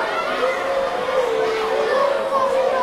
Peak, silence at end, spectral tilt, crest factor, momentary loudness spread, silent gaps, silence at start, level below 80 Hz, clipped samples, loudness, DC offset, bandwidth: -6 dBFS; 0 s; -3 dB/octave; 14 dB; 3 LU; none; 0 s; -54 dBFS; under 0.1%; -20 LUFS; under 0.1%; 14.5 kHz